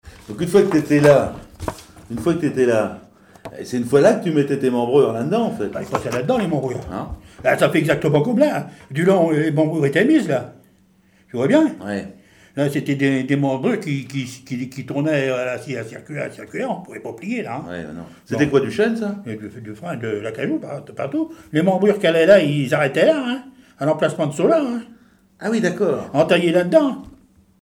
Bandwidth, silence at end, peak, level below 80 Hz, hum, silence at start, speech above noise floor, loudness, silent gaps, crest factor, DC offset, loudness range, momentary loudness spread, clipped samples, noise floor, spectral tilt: 17 kHz; 0.5 s; -2 dBFS; -52 dBFS; none; 0.05 s; 37 dB; -19 LUFS; none; 18 dB; under 0.1%; 6 LU; 15 LU; under 0.1%; -55 dBFS; -6.5 dB/octave